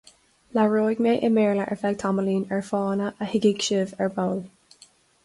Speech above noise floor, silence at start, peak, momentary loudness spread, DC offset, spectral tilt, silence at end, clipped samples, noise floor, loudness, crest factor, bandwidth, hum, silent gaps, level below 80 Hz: 33 dB; 0.55 s; -8 dBFS; 7 LU; under 0.1%; -5.5 dB/octave; 0.8 s; under 0.1%; -56 dBFS; -24 LUFS; 16 dB; 11.5 kHz; none; none; -64 dBFS